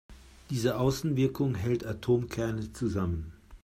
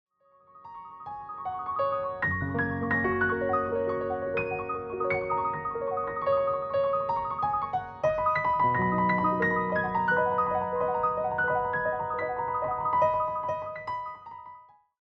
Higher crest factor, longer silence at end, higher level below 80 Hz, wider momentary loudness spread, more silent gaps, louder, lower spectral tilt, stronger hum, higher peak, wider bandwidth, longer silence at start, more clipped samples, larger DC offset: about the same, 16 dB vs 16 dB; second, 0.05 s vs 0.4 s; first, -50 dBFS vs -58 dBFS; second, 6 LU vs 11 LU; neither; about the same, -30 LUFS vs -28 LUFS; second, -7 dB/octave vs -8.5 dB/octave; neither; about the same, -14 dBFS vs -14 dBFS; first, 16 kHz vs 6.2 kHz; second, 0.1 s vs 0.55 s; neither; neither